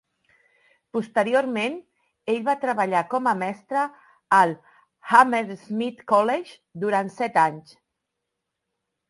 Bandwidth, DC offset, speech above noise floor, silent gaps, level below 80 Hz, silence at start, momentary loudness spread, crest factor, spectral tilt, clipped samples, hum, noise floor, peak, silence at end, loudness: 11.5 kHz; under 0.1%; 59 dB; none; -74 dBFS; 0.95 s; 12 LU; 24 dB; -5.5 dB/octave; under 0.1%; none; -82 dBFS; -2 dBFS; 1.5 s; -23 LUFS